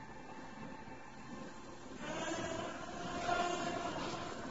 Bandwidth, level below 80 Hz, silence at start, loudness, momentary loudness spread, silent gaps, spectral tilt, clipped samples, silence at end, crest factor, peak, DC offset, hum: 7.6 kHz; -62 dBFS; 0 s; -42 LUFS; 14 LU; none; -3 dB/octave; under 0.1%; 0 s; 18 dB; -24 dBFS; 0.2%; none